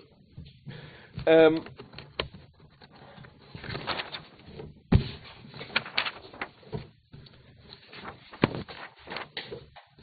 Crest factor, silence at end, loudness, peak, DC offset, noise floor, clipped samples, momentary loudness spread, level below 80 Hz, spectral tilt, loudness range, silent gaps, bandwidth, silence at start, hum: 26 dB; 0.2 s; -29 LUFS; -6 dBFS; under 0.1%; -55 dBFS; under 0.1%; 26 LU; -46 dBFS; -4.5 dB/octave; 9 LU; none; 4.9 kHz; 0.35 s; none